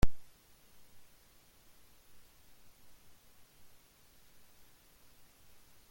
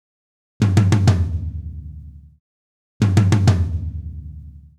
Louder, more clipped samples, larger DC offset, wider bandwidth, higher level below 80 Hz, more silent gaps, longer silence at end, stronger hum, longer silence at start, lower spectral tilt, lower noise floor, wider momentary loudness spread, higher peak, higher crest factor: second, -56 LUFS vs -18 LUFS; neither; neither; first, 17 kHz vs 11 kHz; second, -48 dBFS vs -34 dBFS; second, none vs 2.40-3.00 s; first, 5.7 s vs 0.2 s; neither; second, 0.05 s vs 0.6 s; second, -5.5 dB/octave vs -7 dB/octave; first, -63 dBFS vs -38 dBFS; second, 1 LU vs 22 LU; second, -12 dBFS vs -2 dBFS; first, 24 dB vs 18 dB